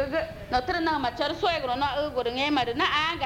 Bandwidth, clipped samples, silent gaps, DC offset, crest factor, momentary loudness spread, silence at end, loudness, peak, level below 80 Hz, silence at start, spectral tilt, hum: 16 kHz; under 0.1%; none; under 0.1%; 16 dB; 5 LU; 0 s; -26 LUFS; -10 dBFS; -48 dBFS; 0 s; -4.5 dB/octave; none